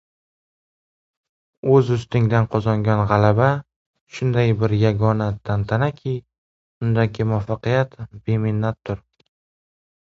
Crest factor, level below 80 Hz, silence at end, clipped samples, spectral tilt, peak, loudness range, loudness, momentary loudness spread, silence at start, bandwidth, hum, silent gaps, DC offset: 20 dB; -46 dBFS; 1.1 s; under 0.1%; -8.5 dB/octave; 0 dBFS; 4 LU; -20 LUFS; 11 LU; 1.65 s; 7.2 kHz; none; 3.76-3.94 s, 4.01-4.07 s, 6.38-6.81 s; under 0.1%